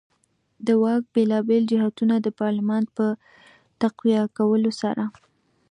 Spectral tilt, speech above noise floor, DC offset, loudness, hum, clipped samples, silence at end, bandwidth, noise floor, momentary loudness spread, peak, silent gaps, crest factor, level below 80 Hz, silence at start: -7.5 dB/octave; 47 dB; under 0.1%; -23 LUFS; none; under 0.1%; 0.6 s; 9.6 kHz; -68 dBFS; 6 LU; -10 dBFS; none; 14 dB; -72 dBFS; 0.6 s